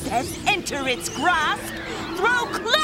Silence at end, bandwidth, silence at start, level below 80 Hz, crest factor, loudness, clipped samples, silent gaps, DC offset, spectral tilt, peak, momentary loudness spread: 0 s; 16 kHz; 0 s; -46 dBFS; 20 dB; -23 LUFS; under 0.1%; none; under 0.1%; -2.5 dB/octave; -4 dBFS; 8 LU